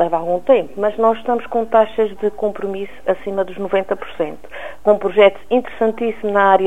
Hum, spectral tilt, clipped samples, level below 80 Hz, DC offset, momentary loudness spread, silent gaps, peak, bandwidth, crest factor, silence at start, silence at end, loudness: none; -6.5 dB/octave; under 0.1%; -52 dBFS; 2%; 11 LU; none; 0 dBFS; 9.4 kHz; 16 dB; 0 s; 0 s; -18 LUFS